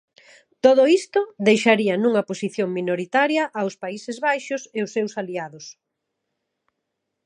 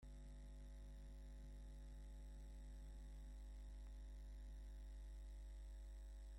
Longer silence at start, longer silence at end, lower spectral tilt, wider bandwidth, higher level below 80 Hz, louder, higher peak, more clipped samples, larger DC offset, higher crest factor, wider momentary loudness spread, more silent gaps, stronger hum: first, 0.65 s vs 0 s; first, 1.55 s vs 0 s; about the same, -5 dB/octave vs -6 dB/octave; about the same, 11 kHz vs 12 kHz; second, -76 dBFS vs -56 dBFS; first, -21 LUFS vs -60 LUFS; first, -2 dBFS vs -48 dBFS; neither; neither; first, 20 dB vs 6 dB; first, 14 LU vs 2 LU; neither; second, none vs 50 Hz at -55 dBFS